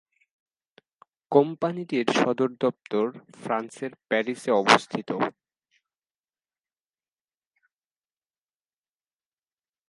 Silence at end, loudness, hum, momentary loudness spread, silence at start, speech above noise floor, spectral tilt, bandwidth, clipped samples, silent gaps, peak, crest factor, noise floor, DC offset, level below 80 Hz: 4.6 s; -25 LUFS; none; 11 LU; 1.3 s; over 65 dB; -4.5 dB/octave; 11.5 kHz; under 0.1%; none; -2 dBFS; 28 dB; under -90 dBFS; under 0.1%; -76 dBFS